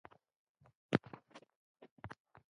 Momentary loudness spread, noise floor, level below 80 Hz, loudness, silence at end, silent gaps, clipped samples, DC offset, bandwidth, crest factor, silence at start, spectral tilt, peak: 23 LU; -58 dBFS; -72 dBFS; -41 LUFS; 0.4 s; 1.56-1.75 s, 1.91-1.96 s; under 0.1%; under 0.1%; 10.5 kHz; 32 dB; 0.9 s; -7 dB/octave; -14 dBFS